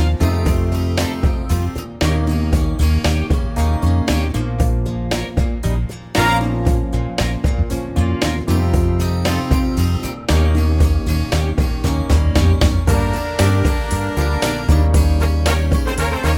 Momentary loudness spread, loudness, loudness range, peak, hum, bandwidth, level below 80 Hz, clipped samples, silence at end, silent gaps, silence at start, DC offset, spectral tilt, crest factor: 5 LU; -18 LUFS; 2 LU; -2 dBFS; none; 16.5 kHz; -20 dBFS; under 0.1%; 0 s; none; 0 s; under 0.1%; -6 dB/octave; 14 dB